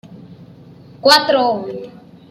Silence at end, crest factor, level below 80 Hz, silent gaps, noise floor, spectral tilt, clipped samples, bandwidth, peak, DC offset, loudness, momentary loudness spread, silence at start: 0.4 s; 18 dB; -62 dBFS; none; -41 dBFS; -2.5 dB/octave; under 0.1%; 16 kHz; 0 dBFS; under 0.1%; -14 LUFS; 20 LU; 0.1 s